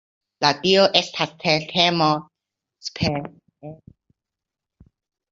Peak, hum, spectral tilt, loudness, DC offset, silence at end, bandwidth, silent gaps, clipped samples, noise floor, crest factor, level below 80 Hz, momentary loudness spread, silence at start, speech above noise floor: -2 dBFS; none; -4.5 dB/octave; -19 LUFS; under 0.1%; 1.55 s; 7.8 kHz; none; under 0.1%; -86 dBFS; 22 dB; -52 dBFS; 23 LU; 0.4 s; 66 dB